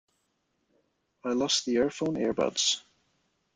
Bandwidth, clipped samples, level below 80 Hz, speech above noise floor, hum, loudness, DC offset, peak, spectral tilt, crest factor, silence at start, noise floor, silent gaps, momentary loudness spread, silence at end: 9.6 kHz; under 0.1%; -66 dBFS; 48 dB; none; -28 LUFS; under 0.1%; -14 dBFS; -2.5 dB/octave; 18 dB; 1.25 s; -76 dBFS; none; 7 LU; 0.75 s